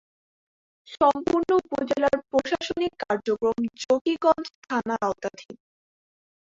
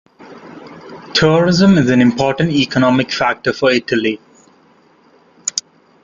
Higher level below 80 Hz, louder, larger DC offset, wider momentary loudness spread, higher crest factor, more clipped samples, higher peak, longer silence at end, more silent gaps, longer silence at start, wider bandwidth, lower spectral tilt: second, -60 dBFS vs -48 dBFS; second, -25 LUFS vs -14 LUFS; neither; second, 7 LU vs 22 LU; about the same, 18 dB vs 14 dB; neither; second, -8 dBFS vs -2 dBFS; first, 1.05 s vs 0.45 s; first, 4.01-4.05 s, 4.55-4.62 s vs none; first, 0.9 s vs 0.3 s; about the same, 7.8 kHz vs 7.6 kHz; about the same, -4.5 dB/octave vs -5 dB/octave